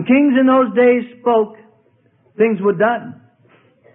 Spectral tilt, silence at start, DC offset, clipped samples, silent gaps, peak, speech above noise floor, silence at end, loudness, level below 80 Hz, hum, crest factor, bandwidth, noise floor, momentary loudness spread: -11.5 dB/octave; 0 s; under 0.1%; under 0.1%; none; -2 dBFS; 42 dB; 0.85 s; -15 LUFS; -62 dBFS; none; 14 dB; 3.7 kHz; -56 dBFS; 10 LU